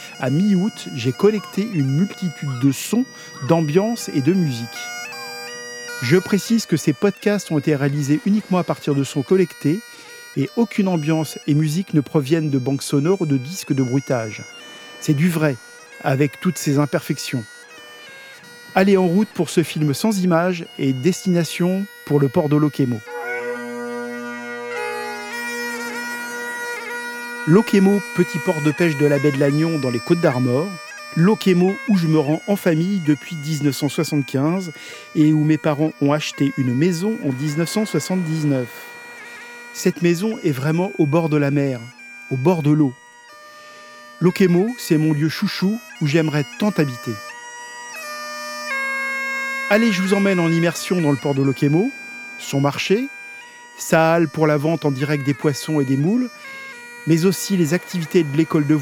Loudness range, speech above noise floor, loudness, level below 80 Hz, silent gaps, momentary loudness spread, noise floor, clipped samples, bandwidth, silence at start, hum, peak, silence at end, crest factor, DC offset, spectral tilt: 4 LU; 25 dB; -20 LUFS; -70 dBFS; none; 14 LU; -43 dBFS; under 0.1%; 18 kHz; 0 s; none; -2 dBFS; 0 s; 18 dB; under 0.1%; -6 dB/octave